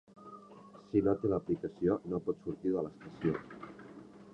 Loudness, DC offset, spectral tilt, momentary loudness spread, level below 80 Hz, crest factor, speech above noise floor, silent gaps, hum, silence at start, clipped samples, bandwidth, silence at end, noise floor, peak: -35 LUFS; under 0.1%; -9.5 dB/octave; 22 LU; -62 dBFS; 20 dB; 21 dB; none; none; 0.15 s; under 0.1%; 7.8 kHz; 0.05 s; -55 dBFS; -16 dBFS